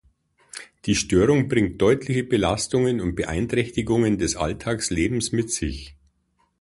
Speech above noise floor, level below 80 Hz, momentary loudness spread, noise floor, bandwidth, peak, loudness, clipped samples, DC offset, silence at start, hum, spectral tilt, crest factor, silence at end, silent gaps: 46 dB; -40 dBFS; 10 LU; -68 dBFS; 11.5 kHz; -6 dBFS; -22 LUFS; under 0.1%; under 0.1%; 0.55 s; none; -5 dB/octave; 18 dB; 0.7 s; none